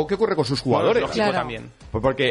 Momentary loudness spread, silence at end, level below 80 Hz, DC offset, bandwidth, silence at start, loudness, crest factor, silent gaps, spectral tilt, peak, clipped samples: 12 LU; 0 s; -46 dBFS; under 0.1%; 11 kHz; 0 s; -22 LUFS; 16 dB; none; -6 dB/octave; -6 dBFS; under 0.1%